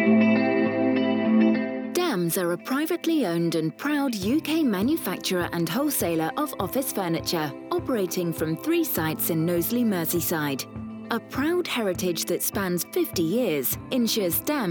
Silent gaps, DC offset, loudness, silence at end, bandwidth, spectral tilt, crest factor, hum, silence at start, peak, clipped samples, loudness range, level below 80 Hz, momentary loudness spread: none; under 0.1%; -25 LUFS; 0 s; over 20 kHz; -4.5 dB/octave; 16 dB; none; 0 s; -10 dBFS; under 0.1%; 2 LU; -56 dBFS; 5 LU